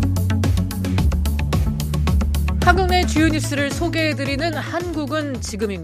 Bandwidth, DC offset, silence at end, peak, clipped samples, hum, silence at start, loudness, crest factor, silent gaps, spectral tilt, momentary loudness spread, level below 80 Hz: 15.5 kHz; under 0.1%; 0 s; 0 dBFS; under 0.1%; none; 0 s; -20 LUFS; 18 dB; none; -5.5 dB/octave; 7 LU; -24 dBFS